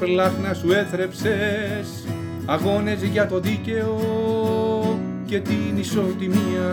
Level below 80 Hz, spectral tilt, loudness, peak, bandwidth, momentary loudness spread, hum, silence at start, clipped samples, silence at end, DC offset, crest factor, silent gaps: -56 dBFS; -6.5 dB/octave; -22 LUFS; -6 dBFS; 19 kHz; 6 LU; none; 0 s; under 0.1%; 0 s; under 0.1%; 16 dB; none